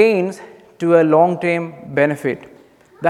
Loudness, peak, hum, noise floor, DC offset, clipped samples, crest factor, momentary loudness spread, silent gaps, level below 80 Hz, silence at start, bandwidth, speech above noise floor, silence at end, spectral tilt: -17 LUFS; 0 dBFS; none; -44 dBFS; under 0.1%; under 0.1%; 16 dB; 12 LU; none; -66 dBFS; 0 s; 13 kHz; 29 dB; 0 s; -7 dB/octave